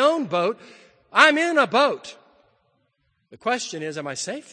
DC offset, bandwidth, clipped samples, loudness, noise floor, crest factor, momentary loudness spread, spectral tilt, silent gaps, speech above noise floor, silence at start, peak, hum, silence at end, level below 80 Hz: under 0.1%; 9.8 kHz; under 0.1%; -21 LUFS; -70 dBFS; 24 dB; 15 LU; -3 dB/octave; none; 48 dB; 0 s; 0 dBFS; none; 0.1 s; -72 dBFS